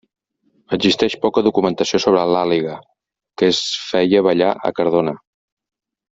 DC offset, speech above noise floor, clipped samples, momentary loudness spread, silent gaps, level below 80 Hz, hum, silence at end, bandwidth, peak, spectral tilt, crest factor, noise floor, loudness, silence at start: under 0.1%; 47 dB; under 0.1%; 8 LU; none; -56 dBFS; none; 0.95 s; 7.8 kHz; -2 dBFS; -5 dB/octave; 16 dB; -63 dBFS; -17 LUFS; 0.7 s